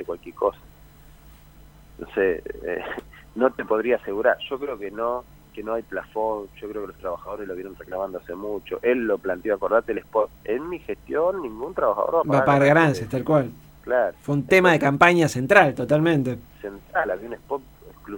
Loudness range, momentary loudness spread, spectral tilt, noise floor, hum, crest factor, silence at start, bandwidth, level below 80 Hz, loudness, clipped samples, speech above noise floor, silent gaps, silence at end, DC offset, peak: 11 LU; 17 LU; -6.5 dB/octave; -49 dBFS; none; 22 dB; 0 s; 16.5 kHz; -52 dBFS; -23 LUFS; under 0.1%; 26 dB; none; 0 s; under 0.1%; 0 dBFS